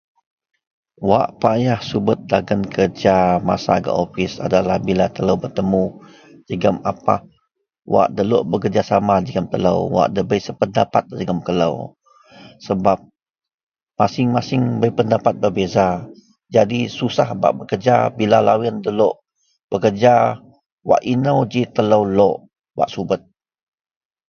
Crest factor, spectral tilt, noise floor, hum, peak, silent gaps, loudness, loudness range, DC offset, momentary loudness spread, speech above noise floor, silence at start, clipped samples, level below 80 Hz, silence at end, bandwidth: 18 dB; -7 dB/octave; -69 dBFS; none; 0 dBFS; 13.63-13.67 s, 19.64-19.68 s, 20.72-20.78 s; -18 LUFS; 4 LU; under 0.1%; 8 LU; 52 dB; 1 s; under 0.1%; -48 dBFS; 1.1 s; 7 kHz